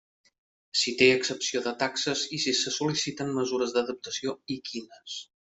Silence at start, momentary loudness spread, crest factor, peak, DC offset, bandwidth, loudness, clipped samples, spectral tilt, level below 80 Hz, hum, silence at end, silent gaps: 0.75 s; 17 LU; 22 dB; -8 dBFS; under 0.1%; 8.2 kHz; -27 LUFS; under 0.1%; -2.5 dB/octave; -70 dBFS; none; 0.3 s; none